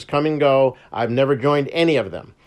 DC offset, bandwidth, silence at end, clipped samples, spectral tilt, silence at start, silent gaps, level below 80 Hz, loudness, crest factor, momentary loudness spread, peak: under 0.1%; 11 kHz; 0.25 s; under 0.1%; -7 dB/octave; 0 s; none; -58 dBFS; -19 LUFS; 14 dB; 6 LU; -4 dBFS